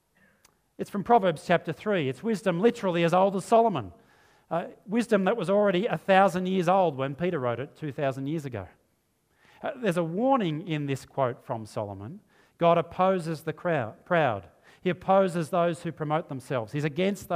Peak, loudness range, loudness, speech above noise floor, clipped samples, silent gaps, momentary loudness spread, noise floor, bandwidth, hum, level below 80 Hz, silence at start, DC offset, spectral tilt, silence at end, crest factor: -6 dBFS; 5 LU; -27 LUFS; 45 dB; under 0.1%; none; 12 LU; -71 dBFS; 15.5 kHz; none; -66 dBFS; 0.8 s; under 0.1%; -6.5 dB/octave; 0 s; 22 dB